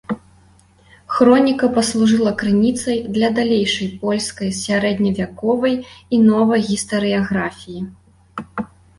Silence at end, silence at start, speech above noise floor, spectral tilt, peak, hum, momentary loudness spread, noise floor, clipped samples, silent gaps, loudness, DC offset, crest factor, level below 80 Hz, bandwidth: 0.35 s; 0.1 s; 34 dB; -5 dB/octave; -2 dBFS; none; 16 LU; -51 dBFS; under 0.1%; none; -17 LUFS; under 0.1%; 16 dB; -50 dBFS; 11.5 kHz